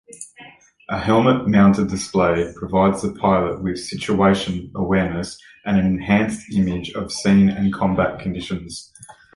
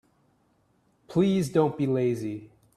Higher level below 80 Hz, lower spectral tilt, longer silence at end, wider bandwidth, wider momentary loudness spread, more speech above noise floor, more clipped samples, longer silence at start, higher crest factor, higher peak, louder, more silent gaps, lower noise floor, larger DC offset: first, -42 dBFS vs -64 dBFS; about the same, -6.5 dB/octave vs -7.5 dB/octave; about the same, 0.25 s vs 0.3 s; second, 11.5 kHz vs 13.5 kHz; about the same, 13 LU vs 11 LU; second, 27 dB vs 43 dB; neither; second, 0.1 s vs 1.1 s; about the same, 16 dB vs 18 dB; first, -2 dBFS vs -10 dBFS; first, -19 LUFS vs -26 LUFS; neither; second, -46 dBFS vs -67 dBFS; neither